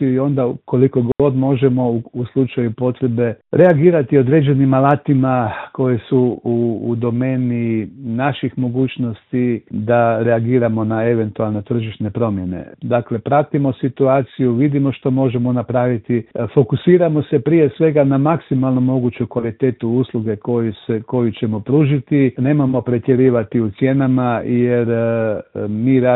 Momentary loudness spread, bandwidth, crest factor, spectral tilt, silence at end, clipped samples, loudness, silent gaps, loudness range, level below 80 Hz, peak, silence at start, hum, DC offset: 7 LU; 4.1 kHz; 16 dB; -12 dB/octave; 0 s; under 0.1%; -17 LUFS; none; 4 LU; -52 dBFS; 0 dBFS; 0 s; none; under 0.1%